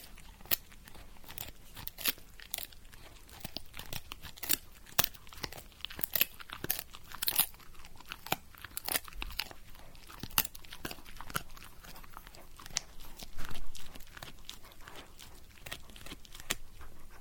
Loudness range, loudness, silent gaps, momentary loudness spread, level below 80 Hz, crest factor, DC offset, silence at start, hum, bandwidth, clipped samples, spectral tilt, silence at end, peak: 11 LU; -36 LUFS; none; 22 LU; -50 dBFS; 36 dB; under 0.1%; 0 s; none; over 20 kHz; under 0.1%; -1 dB/octave; 0 s; -2 dBFS